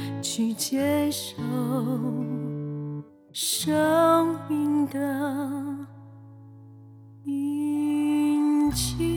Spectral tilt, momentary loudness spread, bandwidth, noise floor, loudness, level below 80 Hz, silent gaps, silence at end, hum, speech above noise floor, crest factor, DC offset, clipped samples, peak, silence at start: -5 dB/octave; 12 LU; 20 kHz; -47 dBFS; -26 LUFS; -50 dBFS; none; 0 s; none; 22 dB; 16 dB; under 0.1%; under 0.1%; -10 dBFS; 0 s